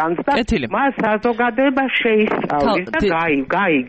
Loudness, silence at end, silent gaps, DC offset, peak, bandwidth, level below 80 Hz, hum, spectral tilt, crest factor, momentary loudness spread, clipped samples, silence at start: -17 LUFS; 0 s; none; under 0.1%; -6 dBFS; 8.4 kHz; -38 dBFS; none; -6 dB/octave; 12 dB; 2 LU; under 0.1%; 0 s